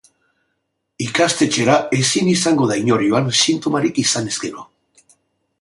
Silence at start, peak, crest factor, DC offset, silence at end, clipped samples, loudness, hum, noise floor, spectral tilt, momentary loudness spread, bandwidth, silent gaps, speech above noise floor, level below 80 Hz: 1 s; -2 dBFS; 18 dB; under 0.1%; 0.95 s; under 0.1%; -16 LUFS; none; -73 dBFS; -3.5 dB/octave; 9 LU; 11.5 kHz; none; 56 dB; -58 dBFS